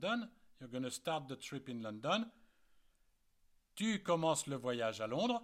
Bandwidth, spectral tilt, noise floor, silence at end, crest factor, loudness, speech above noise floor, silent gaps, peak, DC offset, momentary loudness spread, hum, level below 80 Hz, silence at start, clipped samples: 16 kHz; -4 dB/octave; -74 dBFS; 0 s; 20 dB; -39 LUFS; 36 dB; none; -20 dBFS; under 0.1%; 13 LU; none; -76 dBFS; 0 s; under 0.1%